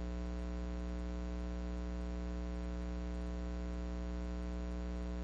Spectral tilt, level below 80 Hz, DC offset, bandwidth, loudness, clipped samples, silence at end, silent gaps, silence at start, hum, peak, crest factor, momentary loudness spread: -7.5 dB/octave; -42 dBFS; under 0.1%; 7.8 kHz; -43 LUFS; under 0.1%; 0 s; none; 0 s; 60 Hz at -40 dBFS; -32 dBFS; 8 dB; 0 LU